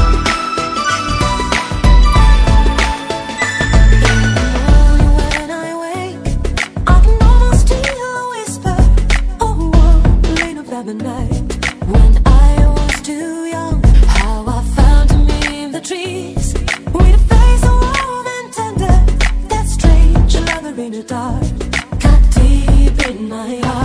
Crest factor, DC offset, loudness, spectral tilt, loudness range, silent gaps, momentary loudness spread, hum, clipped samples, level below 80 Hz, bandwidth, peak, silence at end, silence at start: 10 dB; under 0.1%; -14 LUFS; -5.5 dB/octave; 2 LU; none; 11 LU; none; under 0.1%; -12 dBFS; 11 kHz; 0 dBFS; 0 s; 0 s